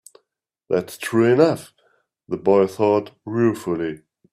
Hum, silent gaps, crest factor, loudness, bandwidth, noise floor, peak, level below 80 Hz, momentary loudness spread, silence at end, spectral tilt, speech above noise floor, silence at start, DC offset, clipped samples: none; none; 18 dB; -20 LUFS; 15.5 kHz; -76 dBFS; -2 dBFS; -62 dBFS; 13 LU; 0.35 s; -6.5 dB/octave; 57 dB; 0.7 s; under 0.1%; under 0.1%